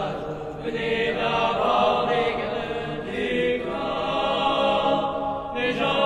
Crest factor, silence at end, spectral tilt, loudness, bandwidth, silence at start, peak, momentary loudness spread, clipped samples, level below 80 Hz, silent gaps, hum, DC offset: 16 dB; 0 s; -5.5 dB/octave; -24 LUFS; 11.5 kHz; 0 s; -8 dBFS; 9 LU; under 0.1%; -48 dBFS; none; none; under 0.1%